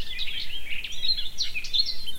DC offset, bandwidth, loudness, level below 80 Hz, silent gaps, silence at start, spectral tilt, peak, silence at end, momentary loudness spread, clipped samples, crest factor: under 0.1%; 16 kHz; -27 LUFS; -40 dBFS; none; 0 s; 0 dB/octave; -10 dBFS; 0 s; 8 LU; under 0.1%; 14 dB